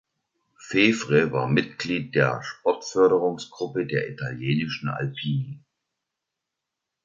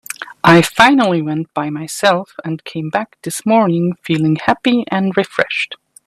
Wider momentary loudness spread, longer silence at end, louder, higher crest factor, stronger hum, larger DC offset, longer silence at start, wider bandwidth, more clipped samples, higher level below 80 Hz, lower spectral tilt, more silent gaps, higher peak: second, 10 LU vs 14 LU; first, 1.45 s vs 0.3 s; second, -24 LUFS vs -15 LUFS; first, 22 dB vs 16 dB; neither; neither; first, 0.6 s vs 0.1 s; second, 7.6 kHz vs 15 kHz; neither; second, -62 dBFS vs -54 dBFS; about the same, -6 dB/octave vs -5 dB/octave; neither; second, -4 dBFS vs 0 dBFS